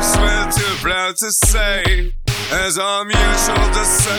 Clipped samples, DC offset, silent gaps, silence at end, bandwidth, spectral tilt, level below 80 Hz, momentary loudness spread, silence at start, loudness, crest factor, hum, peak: under 0.1%; under 0.1%; none; 0 s; 19 kHz; -2.5 dB/octave; -20 dBFS; 5 LU; 0 s; -16 LUFS; 14 dB; none; 0 dBFS